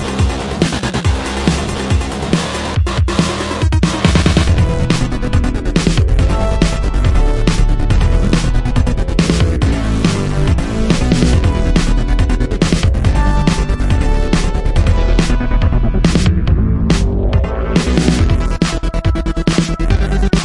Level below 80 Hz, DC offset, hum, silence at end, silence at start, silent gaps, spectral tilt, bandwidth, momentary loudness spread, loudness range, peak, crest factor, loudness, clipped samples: -16 dBFS; under 0.1%; none; 0 s; 0 s; none; -6 dB/octave; 11.5 kHz; 4 LU; 1 LU; 0 dBFS; 12 dB; -15 LUFS; under 0.1%